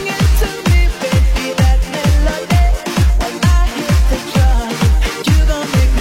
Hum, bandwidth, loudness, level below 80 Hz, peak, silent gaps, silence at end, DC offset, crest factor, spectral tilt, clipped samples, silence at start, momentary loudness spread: none; 16.5 kHz; -14 LUFS; -14 dBFS; -2 dBFS; none; 0 s; under 0.1%; 10 dB; -5.5 dB/octave; under 0.1%; 0 s; 2 LU